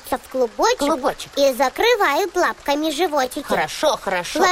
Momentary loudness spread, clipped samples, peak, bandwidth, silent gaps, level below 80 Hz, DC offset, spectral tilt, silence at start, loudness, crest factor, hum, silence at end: 6 LU; under 0.1%; -4 dBFS; 16 kHz; none; -48 dBFS; under 0.1%; -2.5 dB/octave; 0.05 s; -20 LUFS; 16 dB; none; 0 s